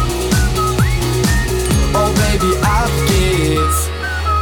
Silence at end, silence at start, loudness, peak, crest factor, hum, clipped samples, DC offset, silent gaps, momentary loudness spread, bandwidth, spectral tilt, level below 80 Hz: 0 s; 0 s; -15 LUFS; -4 dBFS; 10 dB; none; under 0.1%; under 0.1%; none; 2 LU; 19 kHz; -5 dB/octave; -20 dBFS